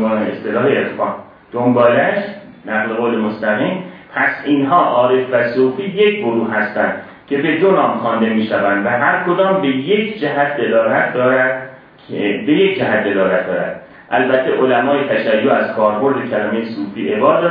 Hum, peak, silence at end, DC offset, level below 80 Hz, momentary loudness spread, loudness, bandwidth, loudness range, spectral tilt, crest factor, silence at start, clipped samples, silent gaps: none; 0 dBFS; 0 s; under 0.1%; -62 dBFS; 9 LU; -15 LUFS; 5.2 kHz; 2 LU; -9.5 dB/octave; 16 dB; 0 s; under 0.1%; none